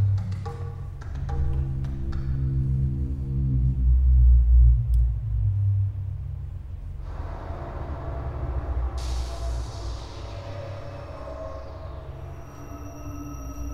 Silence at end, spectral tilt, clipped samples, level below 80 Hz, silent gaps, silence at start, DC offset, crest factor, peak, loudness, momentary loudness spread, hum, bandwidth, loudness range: 0 s; -8 dB/octave; under 0.1%; -26 dBFS; none; 0 s; under 0.1%; 16 dB; -10 dBFS; -27 LUFS; 18 LU; none; 7 kHz; 15 LU